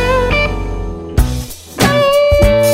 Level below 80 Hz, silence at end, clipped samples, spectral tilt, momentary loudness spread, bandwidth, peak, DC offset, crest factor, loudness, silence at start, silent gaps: -20 dBFS; 0 s; under 0.1%; -5 dB/octave; 13 LU; 16.5 kHz; 0 dBFS; under 0.1%; 12 dB; -13 LUFS; 0 s; none